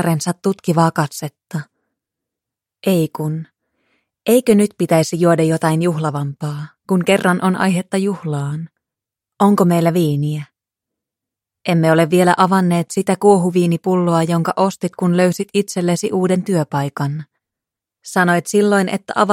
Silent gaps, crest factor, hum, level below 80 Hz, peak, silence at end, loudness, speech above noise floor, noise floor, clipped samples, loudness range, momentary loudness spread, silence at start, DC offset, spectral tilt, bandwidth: none; 16 dB; none; -60 dBFS; 0 dBFS; 0 s; -16 LUFS; 69 dB; -85 dBFS; under 0.1%; 5 LU; 11 LU; 0 s; under 0.1%; -6 dB/octave; 16 kHz